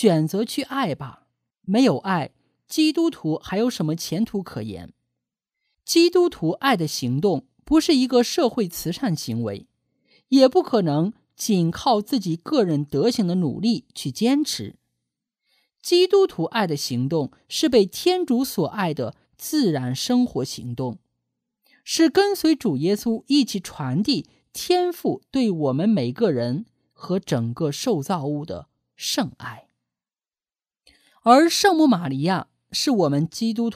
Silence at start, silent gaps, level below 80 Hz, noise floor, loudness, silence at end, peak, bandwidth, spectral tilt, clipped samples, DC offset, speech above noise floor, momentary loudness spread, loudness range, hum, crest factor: 0 s; none; -58 dBFS; under -90 dBFS; -22 LUFS; 0 s; -2 dBFS; 15.5 kHz; -5 dB/octave; under 0.1%; under 0.1%; over 69 dB; 13 LU; 5 LU; none; 22 dB